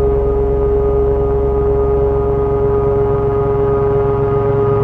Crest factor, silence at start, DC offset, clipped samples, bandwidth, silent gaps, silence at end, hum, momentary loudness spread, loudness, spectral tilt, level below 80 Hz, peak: 10 dB; 0 s; under 0.1%; under 0.1%; 3.5 kHz; none; 0 s; none; 1 LU; -15 LUFS; -11 dB/octave; -22 dBFS; -2 dBFS